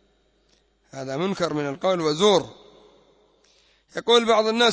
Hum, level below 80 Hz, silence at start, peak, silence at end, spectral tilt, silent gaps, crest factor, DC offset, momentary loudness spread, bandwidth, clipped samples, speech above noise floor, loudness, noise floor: none; -64 dBFS; 0.95 s; -6 dBFS; 0 s; -4 dB/octave; none; 18 dB; under 0.1%; 19 LU; 8 kHz; under 0.1%; 43 dB; -21 LUFS; -64 dBFS